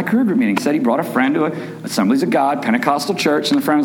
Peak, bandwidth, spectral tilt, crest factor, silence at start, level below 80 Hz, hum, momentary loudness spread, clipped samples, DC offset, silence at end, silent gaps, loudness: -2 dBFS; 18 kHz; -5 dB/octave; 14 dB; 0 s; -68 dBFS; none; 4 LU; under 0.1%; under 0.1%; 0 s; none; -17 LUFS